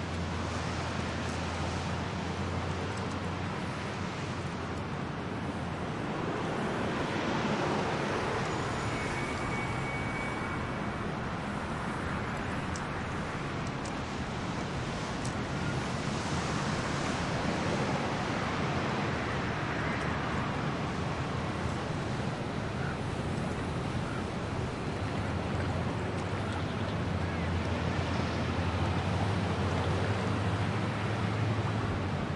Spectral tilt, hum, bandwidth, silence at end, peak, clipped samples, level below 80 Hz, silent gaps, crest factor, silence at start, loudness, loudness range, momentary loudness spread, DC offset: -6 dB/octave; none; 11.5 kHz; 0 s; -18 dBFS; under 0.1%; -50 dBFS; none; 14 dB; 0 s; -33 LUFS; 4 LU; 4 LU; under 0.1%